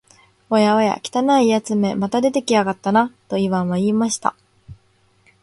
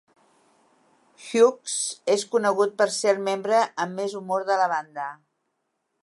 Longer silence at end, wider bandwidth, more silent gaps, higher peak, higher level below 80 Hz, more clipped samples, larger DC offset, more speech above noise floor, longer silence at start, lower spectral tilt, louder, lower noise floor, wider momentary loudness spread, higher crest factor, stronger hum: second, 0.7 s vs 0.9 s; about the same, 11.5 kHz vs 11.5 kHz; neither; first, -2 dBFS vs -6 dBFS; first, -58 dBFS vs -82 dBFS; neither; neither; second, 41 dB vs 53 dB; second, 0.5 s vs 1.2 s; first, -5.5 dB/octave vs -3 dB/octave; first, -18 LUFS vs -24 LUFS; second, -58 dBFS vs -77 dBFS; second, 5 LU vs 10 LU; about the same, 18 dB vs 20 dB; neither